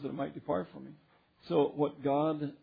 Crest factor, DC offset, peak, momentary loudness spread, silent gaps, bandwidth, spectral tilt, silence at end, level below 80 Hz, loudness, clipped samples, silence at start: 18 dB; under 0.1%; -16 dBFS; 16 LU; none; 5 kHz; -6.5 dB/octave; 0.05 s; -72 dBFS; -33 LUFS; under 0.1%; 0 s